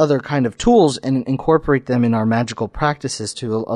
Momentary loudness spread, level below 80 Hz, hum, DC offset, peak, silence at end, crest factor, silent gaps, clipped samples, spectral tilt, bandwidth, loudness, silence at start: 10 LU; -40 dBFS; none; under 0.1%; -4 dBFS; 0 s; 14 dB; none; under 0.1%; -6 dB/octave; 11.5 kHz; -18 LUFS; 0 s